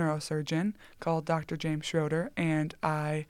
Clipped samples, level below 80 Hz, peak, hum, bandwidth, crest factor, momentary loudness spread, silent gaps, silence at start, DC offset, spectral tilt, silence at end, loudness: under 0.1%; -62 dBFS; -14 dBFS; none; 13 kHz; 18 dB; 3 LU; none; 0 s; under 0.1%; -6 dB/octave; 0.05 s; -32 LUFS